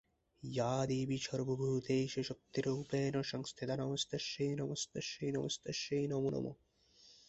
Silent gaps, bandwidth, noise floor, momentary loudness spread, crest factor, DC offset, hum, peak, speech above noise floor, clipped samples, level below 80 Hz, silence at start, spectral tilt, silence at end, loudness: none; 8.2 kHz; -66 dBFS; 6 LU; 18 dB; under 0.1%; none; -22 dBFS; 28 dB; under 0.1%; -70 dBFS; 0.4 s; -5 dB/octave; 0.15 s; -39 LUFS